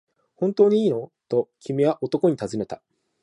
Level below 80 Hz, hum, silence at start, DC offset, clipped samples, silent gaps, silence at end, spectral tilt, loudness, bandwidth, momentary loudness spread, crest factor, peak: -66 dBFS; none; 0.4 s; under 0.1%; under 0.1%; none; 0.45 s; -7.5 dB/octave; -23 LUFS; 10.5 kHz; 12 LU; 18 dB; -6 dBFS